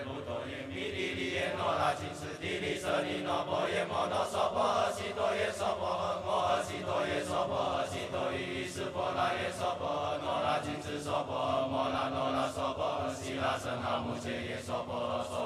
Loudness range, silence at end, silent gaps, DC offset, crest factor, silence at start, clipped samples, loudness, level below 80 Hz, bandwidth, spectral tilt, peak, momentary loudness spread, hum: 2 LU; 0 s; none; under 0.1%; 16 dB; 0 s; under 0.1%; -34 LUFS; -60 dBFS; 14.5 kHz; -4.5 dB/octave; -18 dBFS; 6 LU; none